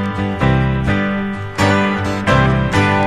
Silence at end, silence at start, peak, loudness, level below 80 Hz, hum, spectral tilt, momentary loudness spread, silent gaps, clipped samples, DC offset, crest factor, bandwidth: 0 s; 0 s; 0 dBFS; -16 LUFS; -28 dBFS; none; -6.5 dB/octave; 6 LU; none; under 0.1%; under 0.1%; 16 dB; 12.5 kHz